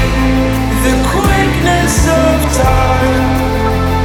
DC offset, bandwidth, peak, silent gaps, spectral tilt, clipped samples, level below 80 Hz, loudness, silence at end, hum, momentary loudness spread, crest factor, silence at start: under 0.1%; 18.5 kHz; 0 dBFS; none; -5.5 dB/octave; under 0.1%; -18 dBFS; -12 LUFS; 0 s; none; 3 LU; 10 dB; 0 s